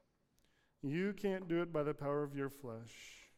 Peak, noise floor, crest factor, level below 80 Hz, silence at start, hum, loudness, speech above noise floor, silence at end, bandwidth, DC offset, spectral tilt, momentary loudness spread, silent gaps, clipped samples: -24 dBFS; -76 dBFS; 16 dB; -68 dBFS; 0.85 s; none; -40 LUFS; 37 dB; 0.1 s; 16 kHz; under 0.1%; -7 dB/octave; 13 LU; none; under 0.1%